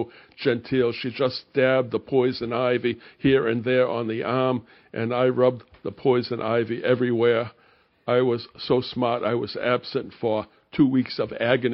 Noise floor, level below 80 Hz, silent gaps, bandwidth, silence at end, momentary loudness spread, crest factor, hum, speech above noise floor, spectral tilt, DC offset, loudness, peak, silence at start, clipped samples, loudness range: -60 dBFS; -60 dBFS; none; 5.8 kHz; 0 s; 8 LU; 20 dB; none; 36 dB; -5 dB/octave; under 0.1%; -24 LUFS; -4 dBFS; 0 s; under 0.1%; 2 LU